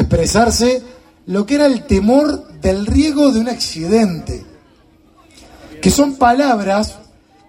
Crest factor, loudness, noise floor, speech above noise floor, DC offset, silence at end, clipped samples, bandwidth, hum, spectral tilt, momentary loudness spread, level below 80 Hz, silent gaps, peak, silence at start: 16 dB; -14 LUFS; -49 dBFS; 36 dB; under 0.1%; 0.5 s; under 0.1%; 16.5 kHz; none; -5 dB/octave; 9 LU; -30 dBFS; none; 0 dBFS; 0 s